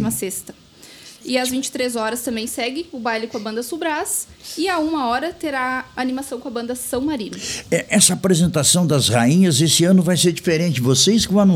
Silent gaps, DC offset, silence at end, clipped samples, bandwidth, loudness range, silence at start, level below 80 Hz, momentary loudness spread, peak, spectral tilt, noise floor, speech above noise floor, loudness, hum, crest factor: none; under 0.1%; 0 s; under 0.1%; 18 kHz; 8 LU; 0 s; -50 dBFS; 12 LU; 0 dBFS; -4 dB/octave; -42 dBFS; 24 dB; -18 LUFS; none; 18 dB